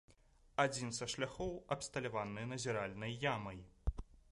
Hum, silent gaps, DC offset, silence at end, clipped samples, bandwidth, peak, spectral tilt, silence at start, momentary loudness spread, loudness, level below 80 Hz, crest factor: none; none; under 0.1%; 0.1 s; under 0.1%; 11.5 kHz; -18 dBFS; -4 dB/octave; 0.1 s; 9 LU; -41 LUFS; -54 dBFS; 22 dB